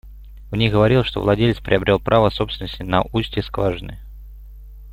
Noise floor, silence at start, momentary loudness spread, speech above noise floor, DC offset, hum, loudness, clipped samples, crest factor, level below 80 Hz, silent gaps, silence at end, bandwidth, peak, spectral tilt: -38 dBFS; 0.05 s; 12 LU; 20 dB; under 0.1%; 50 Hz at -35 dBFS; -19 LUFS; under 0.1%; 20 dB; -36 dBFS; none; 0 s; 15 kHz; 0 dBFS; -8 dB/octave